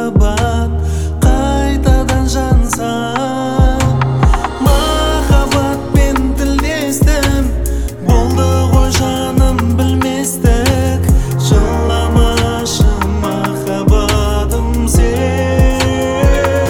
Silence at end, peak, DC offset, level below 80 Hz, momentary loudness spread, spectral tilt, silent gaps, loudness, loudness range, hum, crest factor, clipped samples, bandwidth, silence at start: 0 s; 0 dBFS; under 0.1%; -16 dBFS; 4 LU; -5.5 dB/octave; none; -13 LUFS; 1 LU; none; 12 dB; under 0.1%; 18.5 kHz; 0 s